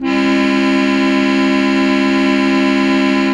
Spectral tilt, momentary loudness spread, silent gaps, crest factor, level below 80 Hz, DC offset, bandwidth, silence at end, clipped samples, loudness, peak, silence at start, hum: -5.5 dB/octave; 0 LU; none; 10 dB; -46 dBFS; under 0.1%; 9.8 kHz; 0 s; under 0.1%; -13 LUFS; -2 dBFS; 0 s; none